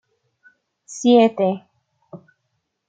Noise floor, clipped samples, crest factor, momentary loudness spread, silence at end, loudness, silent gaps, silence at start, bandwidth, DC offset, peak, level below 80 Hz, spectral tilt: -74 dBFS; under 0.1%; 20 dB; 18 LU; 0.75 s; -17 LUFS; none; 0.9 s; 9 kHz; under 0.1%; -2 dBFS; -74 dBFS; -5.5 dB/octave